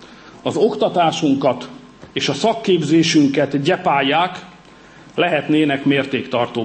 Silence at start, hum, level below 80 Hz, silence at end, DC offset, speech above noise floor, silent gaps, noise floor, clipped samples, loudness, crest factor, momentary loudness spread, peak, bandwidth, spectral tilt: 0 s; none; -60 dBFS; 0 s; under 0.1%; 27 dB; none; -43 dBFS; under 0.1%; -17 LUFS; 14 dB; 11 LU; -4 dBFS; 8.8 kHz; -5 dB/octave